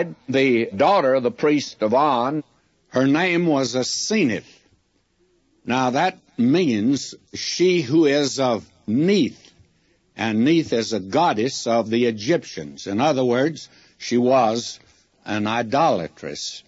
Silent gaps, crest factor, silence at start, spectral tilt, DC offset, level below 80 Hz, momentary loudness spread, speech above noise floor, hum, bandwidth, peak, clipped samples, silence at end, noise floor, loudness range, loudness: none; 16 dB; 0 s; -5 dB/octave; under 0.1%; -66 dBFS; 11 LU; 44 dB; none; 8 kHz; -4 dBFS; under 0.1%; 0.05 s; -64 dBFS; 3 LU; -20 LUFS